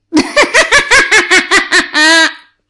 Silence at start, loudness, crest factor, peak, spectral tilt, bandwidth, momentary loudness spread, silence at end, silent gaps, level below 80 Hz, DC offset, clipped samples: 0.1 s; -7 LUFS; 10 dB; 0 dBFS; -0.5 dB/octave; 11.5 kHz; 4 LU; 0.35 s; none; -38 dBFS; under 0.1%; under 0.1%